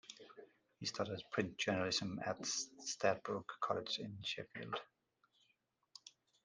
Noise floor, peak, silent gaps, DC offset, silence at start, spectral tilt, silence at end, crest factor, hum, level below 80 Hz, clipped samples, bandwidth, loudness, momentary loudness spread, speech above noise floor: -81 dBFS; -20 dBFS; none; under 0.1%; 0.05 s; -3 dB/octave; 0.35 s; 24 dB; none; -80 dBFS; under 0.1%; 10 kHz; -41 LUFS; 21 LU; 40 dB